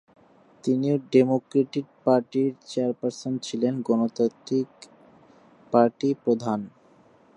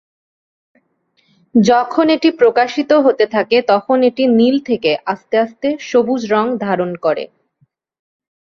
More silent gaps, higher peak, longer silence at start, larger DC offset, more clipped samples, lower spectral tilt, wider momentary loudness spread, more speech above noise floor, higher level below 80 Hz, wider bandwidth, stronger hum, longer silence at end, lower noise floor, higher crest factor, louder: neither; second, -6 dBFS vs 0 dBFS; second, 0.65 s vs 1.55 s; neither; neither; first, -7 dB/octave vs -5.5 dB/octave; about the same, 9 LU vs 7 LU; second, 33 dB vs 48 dB; second, -74 dBFS vs -60 dBFS; first, 10 kHz vs 7.4 kHz; neither; second, 0.65 s vs 1.3 s; second, -57 dBFS vs -62 dBFS; first, 20 dB vs 14 dB; second, -25 LUFS vs -14 LUFS